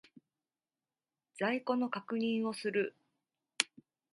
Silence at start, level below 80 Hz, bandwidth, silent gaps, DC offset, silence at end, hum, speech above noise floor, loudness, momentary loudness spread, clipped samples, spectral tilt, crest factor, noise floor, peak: 1.35 s; -86 dBFS; 11.5 kHz; none; under 0.1%; 0.5 s; none; over 56 dB; -35 LUFS; 3 LU; under 0.1%; -3.5 dB/octave; 32 dB; under -90 dBFS; -6 dBFS